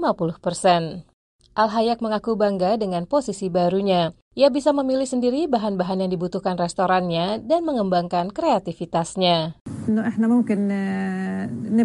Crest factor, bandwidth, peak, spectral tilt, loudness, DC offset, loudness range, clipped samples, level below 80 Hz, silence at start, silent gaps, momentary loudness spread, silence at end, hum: 18 dB; 11.5 kHz; -4 dBFS; -6 dB/octave; -22 LUFS; under 0.1%; 1 LU; under 0.1%; -56 dBFS; 0 s; 1.13-1.39 s, 4.22-4.31 s, 9.61-9.66 s; 6 LU; 0 s; none